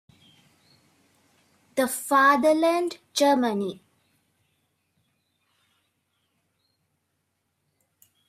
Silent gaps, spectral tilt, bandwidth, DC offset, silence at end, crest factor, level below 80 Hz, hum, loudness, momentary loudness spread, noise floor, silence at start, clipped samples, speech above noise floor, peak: none; -3.5 dB/octave; 15.5 kHz; under 0.1%; 4.55 s; 20 dB; -76 dBFS; none; -23 LUFS; 12 LU; -76 dBFS; 1.75 s; under 0.1%; 54 dB; -8 dBFS